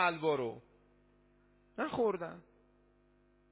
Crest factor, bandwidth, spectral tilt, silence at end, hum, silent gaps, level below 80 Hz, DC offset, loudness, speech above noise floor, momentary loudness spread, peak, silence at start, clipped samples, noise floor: 22 dB; 4 kHz; -3.5 dB/octave; 1.1 s; 50 Hz at -70 dBFS; none; -72 dBFS; under 0.1%; -36 LUFS; 34 dB; 19 LU; -16 dBFS; 0 s; under 0.1%; -69 dBFS